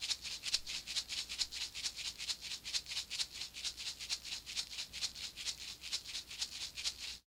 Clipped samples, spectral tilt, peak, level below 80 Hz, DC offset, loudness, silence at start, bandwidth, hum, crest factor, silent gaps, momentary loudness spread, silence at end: under 0.1%; 1.5 dB/octave; -18 dBFS; -66 dBFS; under 0.1%; -40 LUFS; 0 s; 17.5 kHz; none; 24 dB; none; 4 LU; 0.1 s